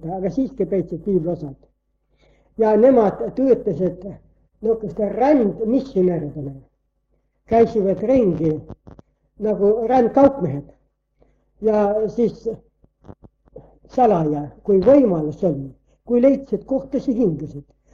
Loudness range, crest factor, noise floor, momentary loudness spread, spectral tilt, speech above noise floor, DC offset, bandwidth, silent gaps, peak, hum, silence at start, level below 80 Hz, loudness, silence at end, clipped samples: 3 LU; 18 dB; -67 dBFS; 15 LU; -9.5 dB/octave; 49 dB; under 0.1%; 7 kHz; none; -2 dBFS; none; 0.05 s; -48 dBFS; -19 LUFS; 0.3 s; under 0.1%